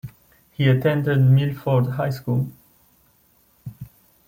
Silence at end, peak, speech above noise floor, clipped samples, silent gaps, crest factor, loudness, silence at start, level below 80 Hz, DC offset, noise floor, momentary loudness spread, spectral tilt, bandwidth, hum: 0.45 s; -6 dBFS; 41 dB; under 0.1%; none; 16 dB; -20 LUFS; 0.05 s; -56 dBFS; under 0.1%; -59 dBFS; 24 LU; -8.5 dB/octave; 16 kHz; none